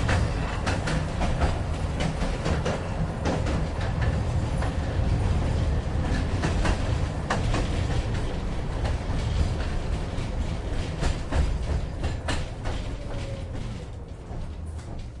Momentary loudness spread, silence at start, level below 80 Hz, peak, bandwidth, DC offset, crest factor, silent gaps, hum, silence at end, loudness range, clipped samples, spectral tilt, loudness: 8 LU; 0 s; -30 dBFS; -12 dBFS; 11.5 kHz; under 0.1%; 14 dB; none; none; 0 s; 4 LU; under 0.1%; -6 dB/octave; -29 LUFS